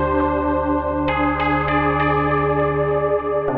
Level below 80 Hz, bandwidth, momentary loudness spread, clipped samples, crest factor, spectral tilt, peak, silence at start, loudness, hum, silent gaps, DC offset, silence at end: -34 dBFS; 4.9 kHz; 3 LU; under 0.1%; 12 dB; -10 dB/octave; -6 dBFS; 0 s; -19 LUFS; none; none; under 0.1%; 0 s